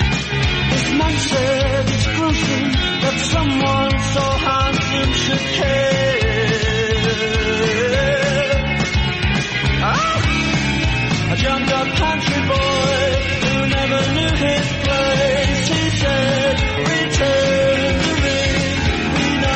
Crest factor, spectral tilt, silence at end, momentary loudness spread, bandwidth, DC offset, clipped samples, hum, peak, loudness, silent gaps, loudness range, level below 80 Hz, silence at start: 12 dB; -4.5 dB/octave; 0 s; 2 LU; 8.8 kHz; under 0.1%; under 0.1%; none; -6 dBFS; -17 LUFS; none; 1 LU; -28 dBFS; 0 s